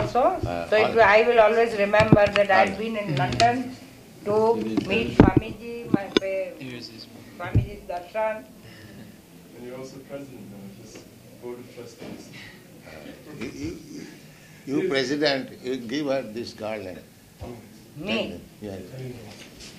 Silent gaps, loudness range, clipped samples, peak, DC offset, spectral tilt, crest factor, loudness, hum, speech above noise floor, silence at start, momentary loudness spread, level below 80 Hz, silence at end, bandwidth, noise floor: none; 21 LU; under 0.1%; 0 dBFS; under 0.1%; -6 dB/octave; 24 dB; -23 LUFS; none; 23 dB; 0 s; 24 LU; -44 dBFS; 0 s; 15.5 kHz; -47 dBFS